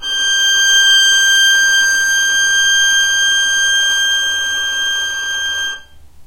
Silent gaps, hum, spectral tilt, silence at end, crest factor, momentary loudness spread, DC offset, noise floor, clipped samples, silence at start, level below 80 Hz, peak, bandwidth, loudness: none; none; 4 dB/octave; 0 s; 12 dB; 9 LU; under 0.1%; -36 dBFS; under 0.1%; 0 s; -48 dBFS; -2 dBFS; 16 kHz; -11 LUFS